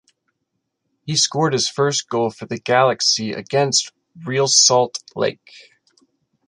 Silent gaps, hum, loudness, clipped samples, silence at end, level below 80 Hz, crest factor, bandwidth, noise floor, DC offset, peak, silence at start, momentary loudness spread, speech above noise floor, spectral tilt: none; none; -17 LUFS; under 0.1%; 0.9 s; -66 dBFS; 18 dB; 11 kHz; -75 dBFS; under 0.1%; -2 dBFS; 1.05 s; 12 LU; 57 dB; -2.5 dB/octave